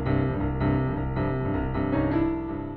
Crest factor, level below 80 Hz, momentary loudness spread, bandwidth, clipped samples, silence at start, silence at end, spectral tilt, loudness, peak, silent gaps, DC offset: 14 dB; -36 dBFS; 3 LU; 4.5 kHz; under 0.1%; 0 s; 0 s; -11.5 dB/octave; -27 LUFS; -12 dBFS; none; under 0.1%